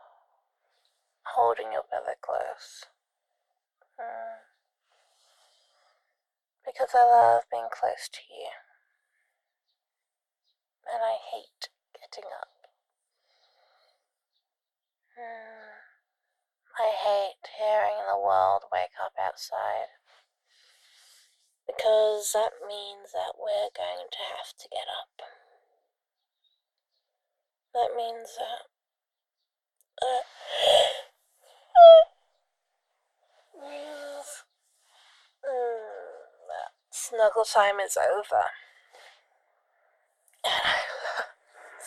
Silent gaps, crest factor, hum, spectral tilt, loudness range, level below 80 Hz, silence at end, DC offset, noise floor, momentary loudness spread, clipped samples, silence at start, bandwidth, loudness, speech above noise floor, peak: none; 26 dB; none; 0 dB/octave; 21 LU; -74 dBFS; 0 s; under 0.1%; under -90 dBFS; 21 LU; under 0.1%; 1.25 s; 14 kHz; -25 LUFS; over 65 dB; -4 dBFS